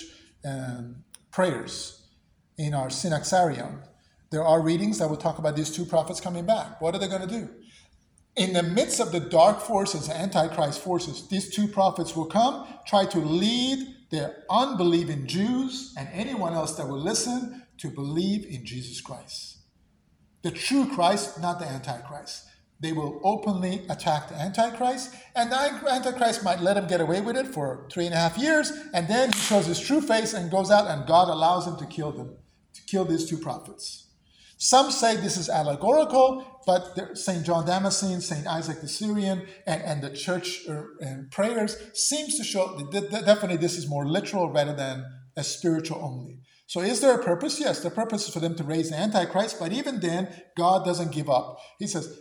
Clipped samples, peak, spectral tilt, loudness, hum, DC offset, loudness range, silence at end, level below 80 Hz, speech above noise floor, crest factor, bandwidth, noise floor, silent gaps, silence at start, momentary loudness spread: under 0.1%; -6 dBFS; -4.5 dB/octave; -26 LUFS; none; under 0.1%; 6 LU; 0 s; -62 dBFS; 38 dB; 20 dB; over 20 kHz; -64 dBFS; none; 0 s; 14 LU